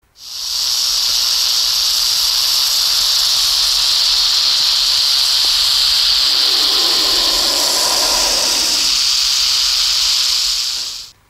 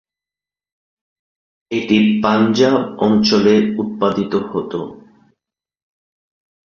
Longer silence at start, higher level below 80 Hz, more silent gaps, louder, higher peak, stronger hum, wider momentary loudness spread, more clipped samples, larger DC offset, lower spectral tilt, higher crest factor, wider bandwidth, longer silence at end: second, 0.2 s vs 1.7 s; first, -44 dBFS vs -54 dBFS; neither; first, -11 LUFS vs -16 LUFS; about the same, 0 dBFS vs -2 dBFS; neither; second, 3 LU vs 11 LU; neither; neither; second, 2 dB/octave vs -6 dB/octave; about the same, 14 dB vs 16 dB; first, 16.5 kHz vs 7 kHz; second, 0.2 s vs 1.7 s